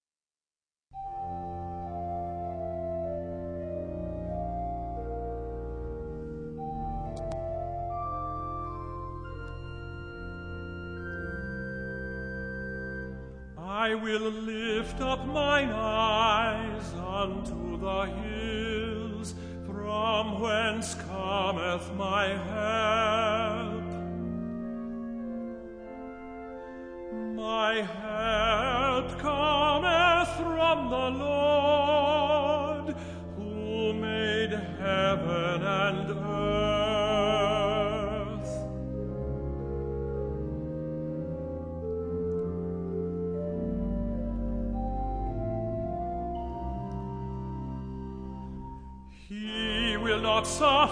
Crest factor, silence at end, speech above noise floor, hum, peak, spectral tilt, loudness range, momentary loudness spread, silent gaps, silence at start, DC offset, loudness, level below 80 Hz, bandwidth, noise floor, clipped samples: 20 dB; 0 s; over 62 dB; none; -10 dBFS; -5 dB/octave; 11 LU; 14 LU; none; 0.9 s; under 0.1%; -30 LUFS; -44 dBFS; 10.5 kHz; under -90 dBFS; under 0.1%